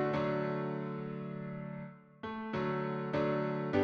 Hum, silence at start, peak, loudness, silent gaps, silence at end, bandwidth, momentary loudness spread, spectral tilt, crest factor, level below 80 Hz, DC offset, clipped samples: none; 0 s; -18 dBFS; -37 LUFS; none; 0 s; 6.6 kHz; 11 LU; -8.5 dB/octave; 18 dB; -68 dBFS; under 0.1%; under 0.1%